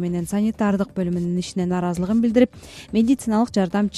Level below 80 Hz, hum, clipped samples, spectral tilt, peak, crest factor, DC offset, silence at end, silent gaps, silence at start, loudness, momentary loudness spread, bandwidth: -48 dBFS; none; under 0.1%; -7 dB/octave; -4 dBFS; 18 dB; under 0.1%; 0 s; none; 0 s; -21 LUFS; 5 LU; 13 kHz